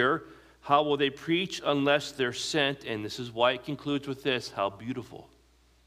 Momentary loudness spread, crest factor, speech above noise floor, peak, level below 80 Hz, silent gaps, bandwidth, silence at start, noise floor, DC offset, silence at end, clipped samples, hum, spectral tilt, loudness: 11 LU; 20 dB; 34 dB; -10 dBFS; -64 dBFS; none; 15.5 kHz; 0 s; -63 dBFS; under 0.1%; 0.65 s; under 0.1%; none; -4.5 dB/octave; -29 LUFS